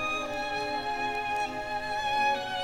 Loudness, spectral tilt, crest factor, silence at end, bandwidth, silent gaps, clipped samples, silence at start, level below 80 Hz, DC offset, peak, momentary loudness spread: -30 LUFS; -3 dB/octave; 14 dB; 0 s; 16 kHz; none; under 0.1%; 0 s; -54 dBFS; under 0.1%; -16 dBFS; 5 LU